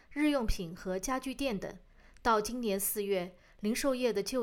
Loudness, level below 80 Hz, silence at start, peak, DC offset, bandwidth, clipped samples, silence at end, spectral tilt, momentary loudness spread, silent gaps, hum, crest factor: -33 LUFS; -46 dBFS; 0.1 s; -16 dBFS; under 0.1%; over 20 kHz; under 0.1%; 0 s; -4 dB/octave; 9 LU; none; none; 18 dB